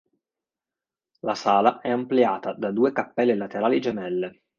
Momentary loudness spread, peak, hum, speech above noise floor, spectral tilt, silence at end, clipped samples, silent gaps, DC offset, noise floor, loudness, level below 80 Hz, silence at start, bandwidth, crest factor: 9 LU; -4 dBFS; none; over 67 dB; -6.5 dB/octave; 0.3 s; under 0.1%; none; under 0.1%; under -90 dBFS; -24 LUFS; -70 dBFS; 1.25 s; 7.2 kHz; 22 dB